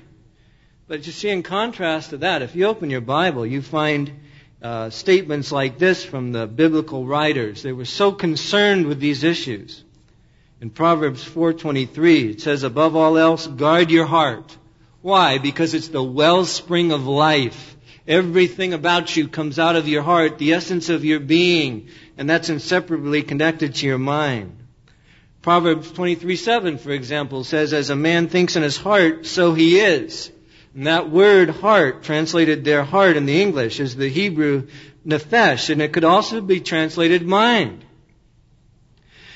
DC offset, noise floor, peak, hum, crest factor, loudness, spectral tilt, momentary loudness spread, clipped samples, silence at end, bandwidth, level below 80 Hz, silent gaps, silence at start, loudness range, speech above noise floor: under 0.1%; -55 dBFS; -2 dBFS; none; 16 dB; -18 LUFS; -5.5 dB/octave; 11 LU; under 0.1%; 0 s; 8 kHz; -56 dBFS; none; 0.9 s; 5 LU; 37 dB